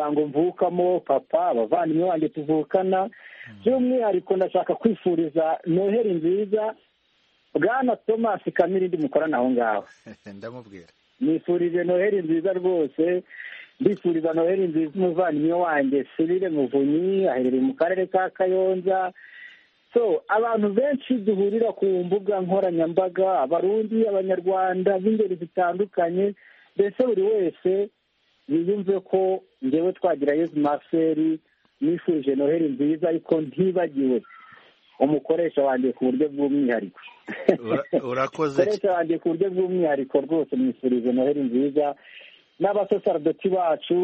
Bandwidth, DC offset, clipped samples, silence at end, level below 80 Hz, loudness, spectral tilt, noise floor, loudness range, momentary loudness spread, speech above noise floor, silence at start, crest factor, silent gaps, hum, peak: 6.6 kHz; under 0.1%; under 0.1%; 0 s; -70 dBFS; -23 LUFS; -6 dB/octave; -67 dBFS; 2 LU; 4 LU; 44 dB; 0 s; 22 dB; none; none; 0 dBFS